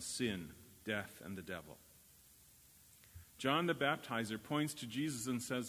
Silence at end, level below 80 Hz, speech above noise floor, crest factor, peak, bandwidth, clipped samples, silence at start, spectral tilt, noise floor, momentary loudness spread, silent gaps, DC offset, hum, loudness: 0 s; -68 dBFS; 24 dB; 22 dB; -18 dBFS; 16 kHz; under 0.1%; 0 s; -4 dB/octave; -64 dBFS; 23 LU; none; under 0.1%; none; -40 LUFS